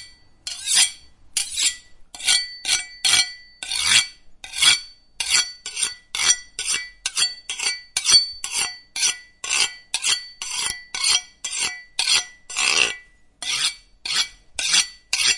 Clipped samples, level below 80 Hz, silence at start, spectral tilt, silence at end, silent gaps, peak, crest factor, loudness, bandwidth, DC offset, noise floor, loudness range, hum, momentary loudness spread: under 0.1%; -56 dBFS; 0 s; 3 dB/octave; 0 s; none; -2 dBFS; 22 dB; -20 LUFS; 11.5 kHz; under 0.1%; -44 dBFS; 3 LU; none; 12 LU